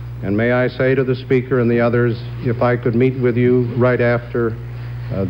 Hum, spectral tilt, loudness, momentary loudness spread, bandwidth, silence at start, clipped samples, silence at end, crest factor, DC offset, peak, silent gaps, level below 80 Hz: none; -10 dB/octave; -17 LUFS; 8 LU; 5.4 kHz; 0 s; under 0.1%; 0 s; 12 dB; under 0.1%; -4 dBFS; none; -40 dBFS